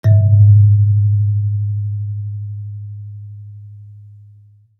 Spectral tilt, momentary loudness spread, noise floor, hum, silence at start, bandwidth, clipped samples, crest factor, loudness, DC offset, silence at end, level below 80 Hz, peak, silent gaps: -11.5 dB/octave; 24 LU; -46 dBFS; none; 0.05 s; 2 kHz; under 0.1%; 12 dB; -14 LUFS; under 0.1%; 0.8 s; -52 dBFS; -2 dBFS; none